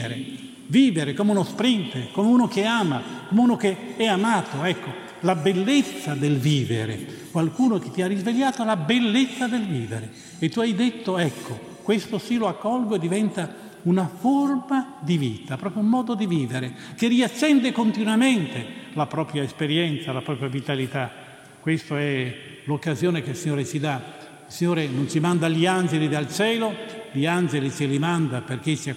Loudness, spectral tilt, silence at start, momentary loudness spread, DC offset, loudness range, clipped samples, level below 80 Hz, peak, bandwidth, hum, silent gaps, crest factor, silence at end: -23 LUFS; -5.5 dB/octave; 0 s; 11 LU; under 0.1%; 5 LU; under 0.1%; -68 dBFS; -6 dBFS; 15.5 kHz; none; none; 16 dB; 0 s